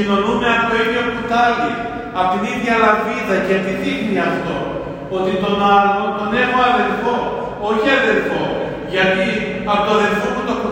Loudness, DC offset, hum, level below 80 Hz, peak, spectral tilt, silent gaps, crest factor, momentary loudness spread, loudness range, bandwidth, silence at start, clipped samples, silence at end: -17 LUFS; under 0.1%; none; -44 dBFS; 0 dBFS; -5.5 dB/octave; none; 16 dB; 8 LU; 2 LU; 16 kHz; 0 s; under 0.1%; 0 s